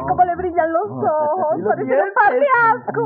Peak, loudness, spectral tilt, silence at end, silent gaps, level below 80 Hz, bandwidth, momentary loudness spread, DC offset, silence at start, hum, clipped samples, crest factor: -4 dBFS; -17 LUFS; -10.5 dB/octave; 0 s; none; -50 dBFS; 4.8 kHz; 6 LU; under 0.1%; 0 s; none; under 0.1%; 14 dB